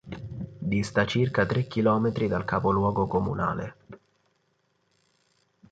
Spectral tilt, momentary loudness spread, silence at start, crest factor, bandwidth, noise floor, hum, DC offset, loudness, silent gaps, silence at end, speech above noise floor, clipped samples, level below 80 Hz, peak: -7 dB/octave; 12 LU; 0.05 s; 20 dB; 9.2 kHz; -72 dBFS; none; under 0.1%; -26 LUFS; none; 1.75 s; 46 dB; under 0.1%; -50 dBFS; -8 dBFS